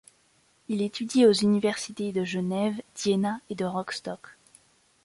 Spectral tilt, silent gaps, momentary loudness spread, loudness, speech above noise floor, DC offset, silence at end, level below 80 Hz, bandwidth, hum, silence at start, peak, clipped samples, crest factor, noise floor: -5 dB/octave; none; 13 LU; -27 LUFS; 39 dB; under 0.1%; 0.75 s; -68 dBFS; 11.5 kHz; none; 0.7 s; -10 dBFS; under 0.1%; 18 dB; -65 dBFS